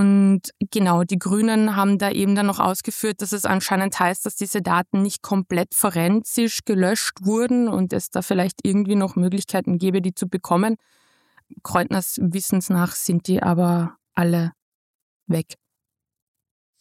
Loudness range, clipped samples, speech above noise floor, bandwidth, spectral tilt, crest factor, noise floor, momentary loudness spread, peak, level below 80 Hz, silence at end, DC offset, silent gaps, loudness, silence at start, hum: 3 LU; under 0.1%; 63 dB; 16.5 kHz; -5.5 dB/octave; 18 dB; -84 dBFS; 6 LU; -4 dBFS; -60 dBFS; 1.3 s; under 0.1%; 14.62-15.20 s; -21 LUFS; 0 s; none